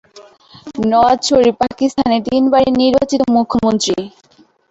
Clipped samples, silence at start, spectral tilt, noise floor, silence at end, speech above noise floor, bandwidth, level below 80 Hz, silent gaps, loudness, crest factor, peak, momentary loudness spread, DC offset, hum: under 0.1%; 0.15 s; -4.5 dB/octave; -42 dBFS; 0.6 s; 29 dB; 8.2 kHz; -46 dBFS; none; -14 LUFS; 12 dB; -2 dBFS; 7 LU; under 0.1%; none